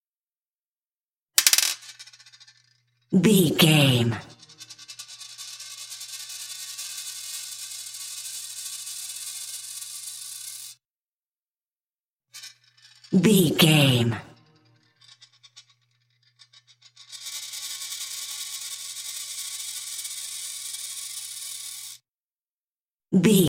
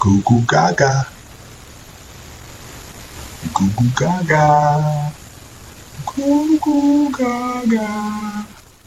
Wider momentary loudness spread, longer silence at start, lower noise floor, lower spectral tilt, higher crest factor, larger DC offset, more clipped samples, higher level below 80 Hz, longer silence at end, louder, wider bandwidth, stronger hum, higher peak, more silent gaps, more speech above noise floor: about the same, 23 LU vs 24 LU; first, 1.35 s vs 0 s; first, under -90 dBFS vs -39 dBFS; second, -4 dB/octave vs -6 dB/octave; first, 28 dB vs 16 dB; neither; neither; second, -68 dBFS vs -44 dBFS; second, 0 s vs 0.35 s; second, -25 LUFS vs -16 LUFS; about the same, 16.5 kHz vs 15.5 kHz; neither; about the same, 0 dBFS vs -2 dBFS; first, 10.90-10.94 s, 11.01-11.55 s, 11.61-11.73 s, 11.90-12.16 s, 22.23-22.75 s, 22.81-22.88 s, 22.94-22.98 s vs none; first, over 71 dB vs 23 dB